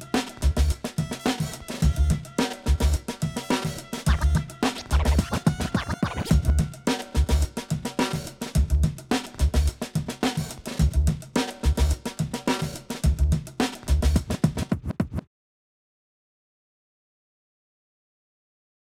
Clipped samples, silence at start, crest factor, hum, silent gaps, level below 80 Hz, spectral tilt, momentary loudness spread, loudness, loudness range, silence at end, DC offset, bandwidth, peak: under 0.1%; 0 s; 18 dB; none; none; -28 dBFS; -5.5 dB/octave; 7 LU; -26 LUFS; 4 LU; 3.75 s; under 0.1%; 15.5 kHz; -8 dBFS